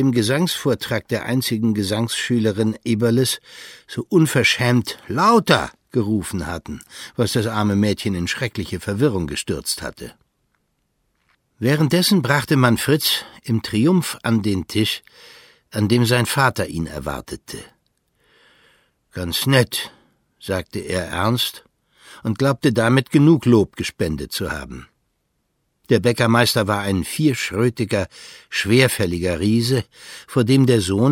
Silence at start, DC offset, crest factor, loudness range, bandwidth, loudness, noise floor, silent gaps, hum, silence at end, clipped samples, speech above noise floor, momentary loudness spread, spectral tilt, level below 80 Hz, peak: 0 s; under 0.1%; 20 dB; 6 LU; 17 kHz; -19 LUFS; -70 dBFS; none; none; 0 s; under 0.1%; 51 dB; 14 LU; -5 dB/octave; -46 dBFS; 0 dBFS